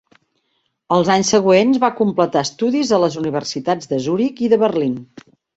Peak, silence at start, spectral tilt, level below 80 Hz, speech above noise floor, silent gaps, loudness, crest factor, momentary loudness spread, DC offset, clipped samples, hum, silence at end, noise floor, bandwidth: -2 dBFS; 0.9 s; -5 dB/octave; -58 dBFS; 52 dB; none; -17 LUFS; 16 dB; 8 LU; under 0.1%; under 0.1%; none; 0.55 s; -68 dBFS; 8 kHz